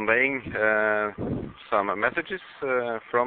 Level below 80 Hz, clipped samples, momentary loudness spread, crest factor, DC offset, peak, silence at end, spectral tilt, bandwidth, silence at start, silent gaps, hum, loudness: -56 dBFS; under 0.1%; 10 LU; 20 dB; under 0.1%; -6 dBFS; 0 s; -10 dB/octave; 4.5 kHz; 0 s; none; none; -26 LUFS